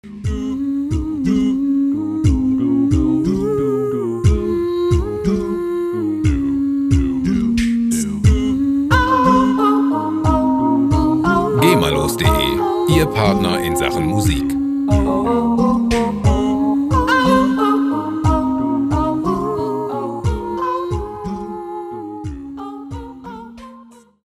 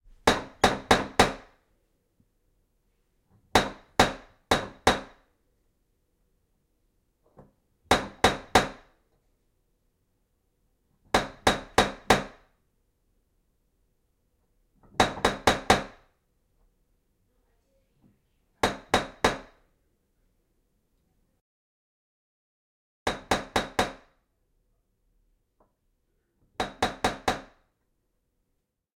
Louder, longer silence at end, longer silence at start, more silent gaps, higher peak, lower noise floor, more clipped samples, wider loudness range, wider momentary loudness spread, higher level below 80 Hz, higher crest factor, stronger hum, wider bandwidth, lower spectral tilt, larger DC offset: first, -17 LUFS vs -26 LUFS; second, 0.45 s vs 1.55 s; second, 0.05 s vs 0.25 s; second, none vs 21.41-23.06 s; first, 0 dBFS vs -4 dBFS; second, -43 dBFS vs -79 dBFS; neither; about the same, 7 LU vs 6 LU; about the same, 12 LU vs 11 LU; first, -28 dBFS vs -48 dBFS; second, 16 dB vs 28 dB; neither; about the same, 15 kHz vs 16.5 kHz; first, -6.5 dB/octave vs -3.5 dB/octave; neither